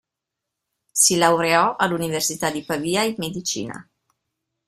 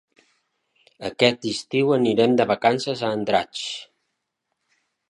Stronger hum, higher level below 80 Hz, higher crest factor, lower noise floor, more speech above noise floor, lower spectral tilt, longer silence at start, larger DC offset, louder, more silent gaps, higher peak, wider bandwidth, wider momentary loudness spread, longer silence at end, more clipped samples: neither; about the same, -60 dBFS vs -64 dBFS; about the same, 20 dB vs 22 dB; first, -84 dBFS vs -78 dBFS; first, 63 dB vs 57 dB; second, -2.5 dB/octave vs -5 dB/octave; about the same, 0.95 s vs 1 s; neither; about the same, -20 LUFS vs -21 LUFS; neither; about the same, -2 dBFS vs -2 dBFS; first, 16 kHz vs 11 kHz; about the same, 11 LU vs 13 LU; second, 0.85 s vs 1.25 s; neither